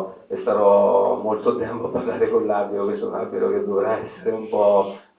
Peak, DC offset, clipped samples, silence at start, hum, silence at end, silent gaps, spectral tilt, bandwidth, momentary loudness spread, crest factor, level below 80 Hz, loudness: -4 dBFS; under 0.1%; under 0.1%; 0 s; none; 0.2 s; none; -10.5 dB/octave; 4 kHz; 10 LU; 16 dB; -60 dBFS; -21 LUFS